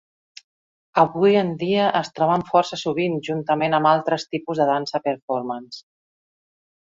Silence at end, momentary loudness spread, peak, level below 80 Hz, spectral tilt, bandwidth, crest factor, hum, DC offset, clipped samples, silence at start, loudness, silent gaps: 1 s; 9 LU; -2 dBFS; -66 dBFS; -6 dB/octave; 7.8 kHz; 20 dB; none; under 0.1%; under 0.1%; 0.95 s; -21 LUFS; 5.22-5.28 s